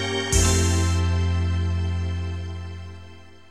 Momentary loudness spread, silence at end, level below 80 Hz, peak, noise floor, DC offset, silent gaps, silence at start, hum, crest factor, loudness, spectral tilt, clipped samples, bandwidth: 17 LU; 0.25 s; -32 dBFS; -6 dBFS; -45 dBFS; 0.5%; none; 0 s; none; 18 dB; -23 LUFS; -4.5 dB/octave; under 0.1%; 13.5 kHz